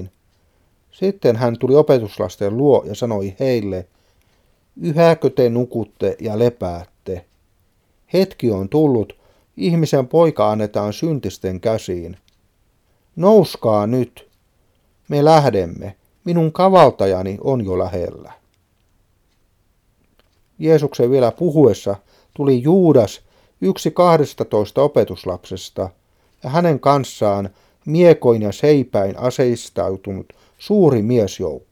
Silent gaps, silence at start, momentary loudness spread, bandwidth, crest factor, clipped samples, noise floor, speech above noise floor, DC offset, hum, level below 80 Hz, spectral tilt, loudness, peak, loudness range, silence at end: none; 0 s; 15 LU; 16 kHz; 18 dB; under 0.1%; -61 dBFS; 45 dB; under 0.1%; none; -52 dBFS; -7.5 dB/octave; -17 LUFS; 0 dBFS; 5 LU; 0.15 s